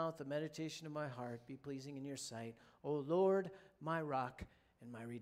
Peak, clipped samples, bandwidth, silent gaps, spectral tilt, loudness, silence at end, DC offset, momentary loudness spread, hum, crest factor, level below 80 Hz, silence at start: -24 dBFS; under 0.1%; 15 kHz; none; -5.5 dB/octave; -43 LUFS; 0 s; under 0.1%; 17 LU; none; 18 dB; -72 dBFS; 0 s